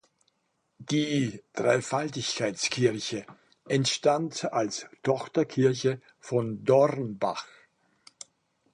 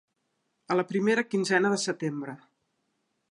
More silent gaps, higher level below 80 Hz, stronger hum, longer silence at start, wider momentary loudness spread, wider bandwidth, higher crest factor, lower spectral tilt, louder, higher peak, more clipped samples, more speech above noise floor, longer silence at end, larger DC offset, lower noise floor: neither; first, -70 dBFS vs -80 dBFS; neither; about the same, 0.8 s vs 0.7 s; about the same, 14 LU vs 14 LU; about the same, 11.5 kHz vs 11.5 kHz; about the same, 20 dB vs 20 dB; about the same, -4.5 dB/octave vs -4.5 dB/octave; about the same, -28 LUFS vs -27 LUFS; about the same, -8 dBFS vs -10 dBFS; neither; about the same, 48 dB vs 51 dB; first, 1.3 s vs 0.95 s; neither; about the same, -75 dBFS vs -78 dBFS